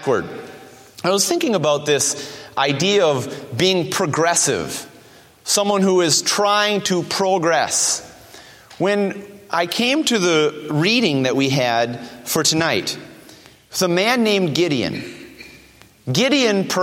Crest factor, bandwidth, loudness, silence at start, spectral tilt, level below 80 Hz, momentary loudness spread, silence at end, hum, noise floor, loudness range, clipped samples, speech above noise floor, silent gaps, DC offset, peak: 16 dB; 16.5 kHz; -18 LUFS; 0 s; -3 dB/octave; -60 dBFS; 12 LU; 0 s; none; -48 dBFS; 2 LU; under 0.1%; 30 dB; none; under 0.1%; -2 dBFS